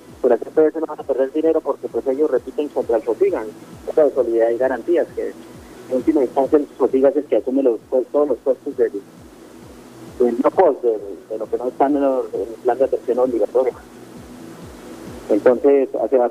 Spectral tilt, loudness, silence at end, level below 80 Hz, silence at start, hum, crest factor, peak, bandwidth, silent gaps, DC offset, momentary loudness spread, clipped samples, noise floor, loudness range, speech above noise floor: -7 dB/octave; -19 LUFS; 0 s; -54 dBFS; 0.1 s; none; 18 dB; -2 dBFS; 14 kHz; none; under 0.1%; 20 LU; under 0.1%; -41 dBFS; 2 LU; 23 dB